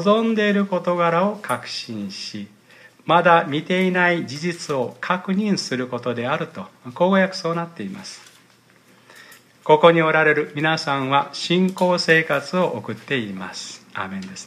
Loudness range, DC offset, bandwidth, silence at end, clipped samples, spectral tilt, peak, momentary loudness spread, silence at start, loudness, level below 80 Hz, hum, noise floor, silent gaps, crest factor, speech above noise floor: 6 LU; under 0.1%; 14.5 kHz; 0 s; under 0.1%; -5.5 dB/octave; 0 dBFS; 16 LU; 0 s; -20 LUFS; -72 dBFS; none; -54 dBFS; none; 20 dB; 34 dB